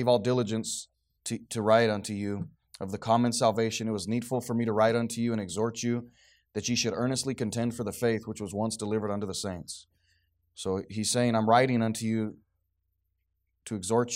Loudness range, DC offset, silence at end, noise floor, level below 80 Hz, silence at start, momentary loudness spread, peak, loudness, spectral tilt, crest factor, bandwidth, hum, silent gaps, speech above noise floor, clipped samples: 4 LU; under 0.1%; 0 s; -78 dBFS; -66 dBFS; 0 s; 14 LU; -8 dBFS; -29 LUFS; -5 dB/octave; 20 dB; 16 kHz; none; none; 50 dB; under 0.1%